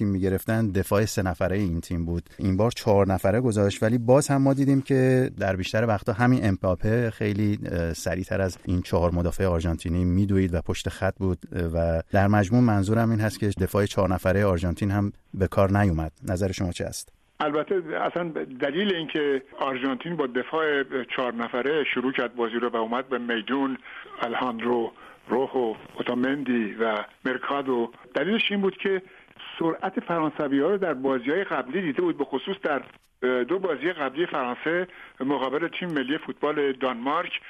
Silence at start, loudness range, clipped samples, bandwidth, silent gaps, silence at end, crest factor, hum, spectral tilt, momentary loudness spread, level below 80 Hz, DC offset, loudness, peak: 0 s; 5 LU; under 0.1%; 13.5 kHz; none; 0 s; 18 dB; none; -6.5 dB/octave; 8 LU; -44 dBFS; under 0.1%; -25 LUFS; -6 dBFS